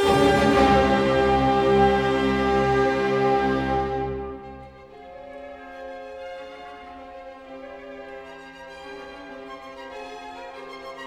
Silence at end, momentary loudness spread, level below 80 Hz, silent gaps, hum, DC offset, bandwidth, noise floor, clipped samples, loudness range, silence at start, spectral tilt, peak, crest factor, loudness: 0 s; 23 LU; -42 dBFS; none; none; under 0.1%; 14 kHz; -43 dBFS; under 0.1%; 20 LU; 0 s; -6 dB/octave; -6 dBFS; 18 dB; -20 LUFS